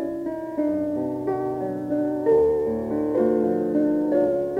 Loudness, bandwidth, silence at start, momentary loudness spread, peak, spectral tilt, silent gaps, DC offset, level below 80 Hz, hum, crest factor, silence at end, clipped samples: -23 LUFS; 5 kHz; 0 s; 8 LU; -10 dBFS; -9.5 dB/octave; none; under 0.1%; -54 dBFS; none; 14 dB; 0 s; under 0.1%